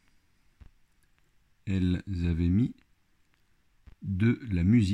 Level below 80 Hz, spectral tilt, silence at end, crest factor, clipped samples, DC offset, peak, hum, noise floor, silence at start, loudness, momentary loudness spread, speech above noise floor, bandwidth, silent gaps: -52 dBFS; -8.5 dB/octave; 0 s; 16 dB; under 0.1%; under 0.1%; -14 dBFS; none; -69 dBFS; 1.65 s; -28 LUFS; 11 LU; 43 dB; 9.8 kHz; none